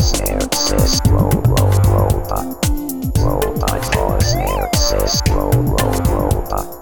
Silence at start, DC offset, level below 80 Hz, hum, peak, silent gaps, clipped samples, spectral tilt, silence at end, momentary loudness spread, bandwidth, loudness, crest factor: 0 s; 0.8%; -20 dBFS; none; -2 dBFS; none; under 0.1%; -5 dB/octave; 0 s; 6 LU; over 20 kHz; -16 LUFS; 14 dB